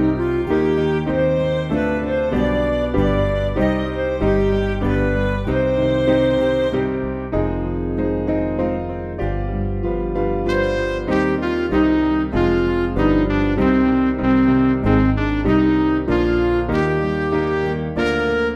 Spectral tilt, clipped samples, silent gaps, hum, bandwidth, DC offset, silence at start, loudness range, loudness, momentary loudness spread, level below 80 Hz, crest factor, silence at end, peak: -8.5 dB/octave; under 0.1%; none; none; 8.8 kHz; 0.1%; 0 s; 5 LU; -19 LUFS; 6 LU; -28 dBFS; 14 dB; 0 s; -4 dBFS